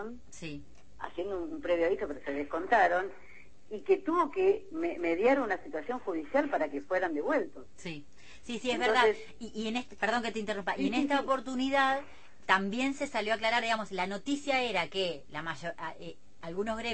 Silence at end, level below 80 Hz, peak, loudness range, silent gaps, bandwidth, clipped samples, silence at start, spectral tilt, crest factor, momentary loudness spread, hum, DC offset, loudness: 0 s; -62 dBFS; -10 dBFS; 2 LU; none; 8.8 kHz; under 0.1%; 0 s; -4 dB/octave; 22 dB; 16 LU; none; 0.5%; -31 LUFS